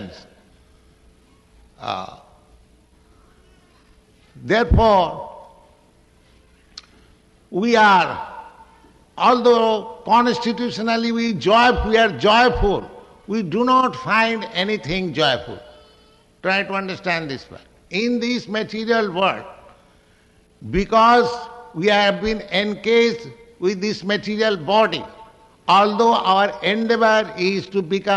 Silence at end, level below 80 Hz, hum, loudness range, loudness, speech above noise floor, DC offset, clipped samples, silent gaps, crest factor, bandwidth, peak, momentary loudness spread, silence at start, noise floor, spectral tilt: 0 s; -38 dBFS; none; 7 LU; -18 LUFS; 37 dB; under 0.1%; under 0.1%; none; 16 dB; 10.5 kHz; -4 dBFS; 16 LU; 0 s; -55 dBFS; -5 dB/octave